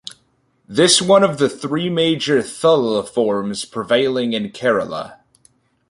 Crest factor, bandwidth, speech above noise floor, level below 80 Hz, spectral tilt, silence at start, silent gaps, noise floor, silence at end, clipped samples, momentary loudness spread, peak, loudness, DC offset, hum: 16 dB; 11.5 kHz; 45 dB; -60 dBFS; -3.5 dB/octave; 0.7 s; none; -62 dBFS; 0.75 s; under 0.1%; 12 LU; -2 dBFS; -17 LUFS; under 0.1%; none